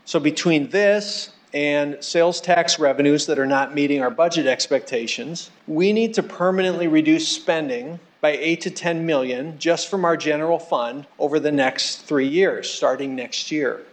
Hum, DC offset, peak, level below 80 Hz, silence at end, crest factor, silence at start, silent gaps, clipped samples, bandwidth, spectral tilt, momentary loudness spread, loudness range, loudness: none; under 0.1%; -6 dBFS; -78 dBFS; 0.1 s; 14 dB; 0.05 s; none; under 0.1%; 9.2 kHz; -4 dB/octave; 8 LU; 3 LU; -20 LUFS